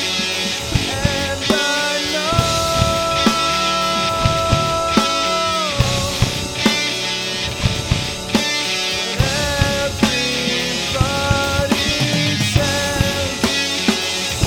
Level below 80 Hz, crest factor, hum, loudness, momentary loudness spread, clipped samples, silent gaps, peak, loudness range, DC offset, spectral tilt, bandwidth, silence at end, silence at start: -32 dBFS; 18 dB; none; -17 LUFS; 3 LU; under 0.1%; none; 0 dBFS; 2 LU; under 0.1%; -3.5 dB/octave; over 20 kHz; 0 s; 0 s